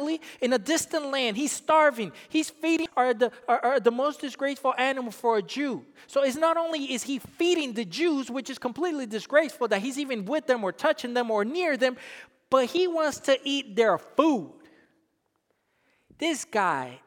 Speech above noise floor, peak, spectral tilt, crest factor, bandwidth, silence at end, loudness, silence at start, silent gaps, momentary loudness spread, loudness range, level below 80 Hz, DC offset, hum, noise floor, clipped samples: 48 dB; -6 dBFS; -3 dB/octave; 20 dB; 19 kHz; 0.1 s; -26 LUFS; 0 s; none; 7 LU; 3 LU; -74 dBFS; under 0.1%; none; -74 dBFS; under 0.1%